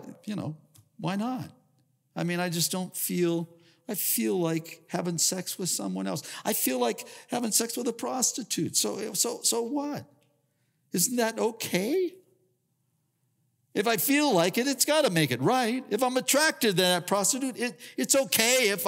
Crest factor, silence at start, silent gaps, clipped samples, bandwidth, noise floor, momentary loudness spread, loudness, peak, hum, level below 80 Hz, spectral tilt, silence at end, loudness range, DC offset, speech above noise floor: 20 dB; 0 s; none; under 0.1%; 16.5 kHz; -75 dBFS; 12 LU; -27 LUFS; -8 dBFS; none; -82 dBFS; -3 dB/octave; 0 s; 6 LU; under 0.1%; 47 dB